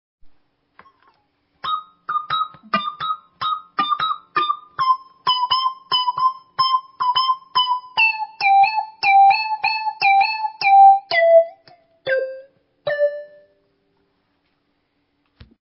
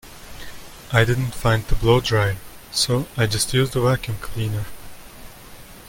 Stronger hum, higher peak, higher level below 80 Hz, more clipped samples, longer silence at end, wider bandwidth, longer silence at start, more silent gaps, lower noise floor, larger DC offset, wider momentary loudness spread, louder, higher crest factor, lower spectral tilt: neither; second, -4 dBFS vs 0 dBFS; second, -64 dBFS vs -34 dBFS; neither; first, 2.45 s vs 0 s; second, 5.8 kHz vs 17 kHz; first, 0.25 s vs 0.05 s; neither; first, -68 dBFS vs -41 dBFS; neither; second, 13 LU vs 23 LU; first, -18 LUFS vs -21 LUFS; about the same, 16 dB vs 20 dB; about the same, -5.5 dB/octave vs -4.5 dB/octave